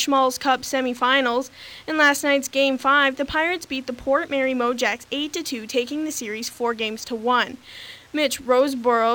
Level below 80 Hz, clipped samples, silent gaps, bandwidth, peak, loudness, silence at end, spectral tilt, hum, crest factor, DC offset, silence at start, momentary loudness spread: -56 dBFS; under 0.1%; none; 19 kHz; -6 dBFS; -22 LUFS; 0 s; -2 dB/octave; none; 16 dB; under 0.1%; 0 s; 10 LU